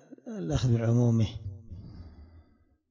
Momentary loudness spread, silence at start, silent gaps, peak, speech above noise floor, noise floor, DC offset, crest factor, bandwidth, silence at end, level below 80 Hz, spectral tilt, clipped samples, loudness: 22 LU; 0.25 s; none; -14 dBFS; 38 dB; -64 dBFS; under 0.1%; 16 dB; 7.6 kHz; 0.5 s; -48 dBFS; -7.5 dB/octave; under 0.1%; -27 LUFS